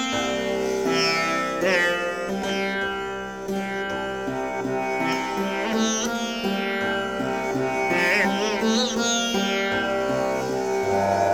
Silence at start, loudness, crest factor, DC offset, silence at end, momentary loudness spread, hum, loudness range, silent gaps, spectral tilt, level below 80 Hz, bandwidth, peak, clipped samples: 0 s; -24 LUFS; 18 dB; 0.2%; 0 s; 7 LU; none; 4 LU; none; -3.5 dB/octave; -54 dBFS; 19 kHz; -6 dBFS; under 0.1%